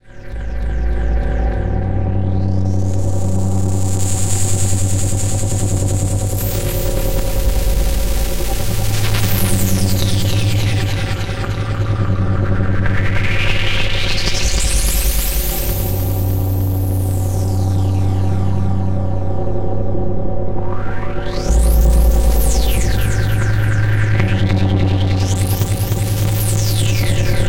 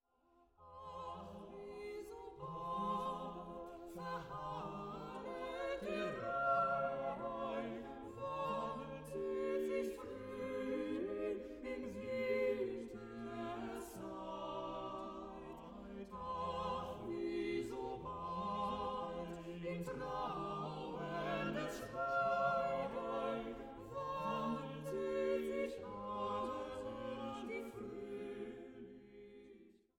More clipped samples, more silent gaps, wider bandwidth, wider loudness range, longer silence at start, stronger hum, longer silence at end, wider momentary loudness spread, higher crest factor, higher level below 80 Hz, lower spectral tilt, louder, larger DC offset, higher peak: neither; neither; about the same, 17 kHz vs 17 kHz; second, 3 LU vs 6 LU; second, 0.15 s vs 0.6 s; neither; second, 0 s vs 0.25 s; second, 5 LU vs 12 LU; second, 12 dB vs 18 dB; first, -20 dBFS vs -66 dBFS; about the same, -5 dB/octave vs -6 dB/octave; first, -18 LUFS vs -43 LUFS; neither; first, -2 dBFS vs -24 dBFS